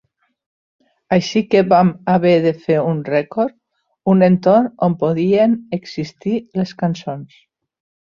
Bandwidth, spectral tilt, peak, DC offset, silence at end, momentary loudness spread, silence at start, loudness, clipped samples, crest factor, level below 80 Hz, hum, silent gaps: 7 kHz; -7.5 dB/octave; -2 dBFS; under 0.1%; 0.85 s; 11 LU; 1.1 s; -16 LUFS; under 0.1%; 16 dB; -58 dBFS; none; none